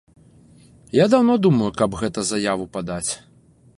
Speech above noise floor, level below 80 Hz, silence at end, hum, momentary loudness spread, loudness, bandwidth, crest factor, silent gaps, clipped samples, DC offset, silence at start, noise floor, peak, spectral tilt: 31 dB; -50 dBFS; 0.6 s; none; 11 LU; -20 LUFS; 11.5 kHz; 18 dB; none; under 0.1%; under 0.1%; 0.95 s; -50 dBFS; -2 dBFS; -5.5 dB/octave